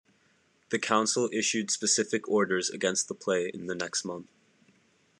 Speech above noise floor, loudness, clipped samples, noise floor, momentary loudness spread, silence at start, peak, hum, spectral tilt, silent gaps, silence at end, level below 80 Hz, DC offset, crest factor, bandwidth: 38 dB; -28 LUFS; under 0.1%; -67 dBFS; 9 LU; 0.7 s; -10 dBFS; none; -2.5 dB/octave; none; 0.95 s; -80 dBFS; under 0.1%; 20 dB; 12 kHz